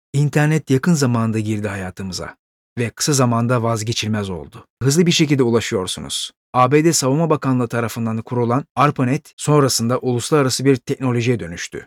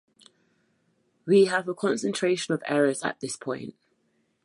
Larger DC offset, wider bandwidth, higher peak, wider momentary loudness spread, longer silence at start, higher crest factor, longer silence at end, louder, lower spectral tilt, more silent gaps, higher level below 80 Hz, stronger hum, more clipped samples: neither; first, 17 kHz vs 11.5 kHz; first, -2 dBFS vs -10 dBFS; second, 11 LU vs 14 LU; second, 0.15 s vs 1.25 s; about the same, 16 dB vs 18 dB; second, 0 s vs 0.75 s; first, -18 LUFS vs -26 LUFS; about the same, -5 dB/octave vs -4.5 dB/octave; first, 2.39-2.76 s, 4.70-4.77 s, 6.36-6.53 s, 8.70-8.75 s, 9.33-9.37 s vs none; first, -52 dBFS vs -76 dBFS; neither; neither